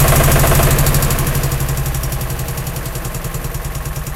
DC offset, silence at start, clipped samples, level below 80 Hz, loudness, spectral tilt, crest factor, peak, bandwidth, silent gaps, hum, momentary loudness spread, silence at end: under 0.1%; 0 s; under 0.1%; -20 dBFS; -17 LUFS; -4.5 dB/octave; 16 dB; 0 dBFS; 17.5 kHz; none; none; 12 LU; 0 s